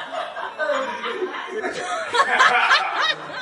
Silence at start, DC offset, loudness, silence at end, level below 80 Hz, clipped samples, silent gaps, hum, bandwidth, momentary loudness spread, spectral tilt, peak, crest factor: 0 s; under 0.1%; -20 LUFS; 0 s; -72 dBFS; under 0.1%; none; none; 11.5 kHz; 12 LU; -1 dB/octave; -2 dBFS; 20 dB